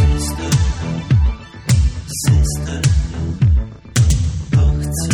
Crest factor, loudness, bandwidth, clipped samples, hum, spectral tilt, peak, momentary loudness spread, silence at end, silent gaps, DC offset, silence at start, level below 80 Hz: 14 dB; -17 LUFS; 16.5 kHz; under 0.1%; none; -5.5 dB/octave; -2 dBFS; 5 LU; 0 s; none; under 0.1%; 0 s; -20 dBFS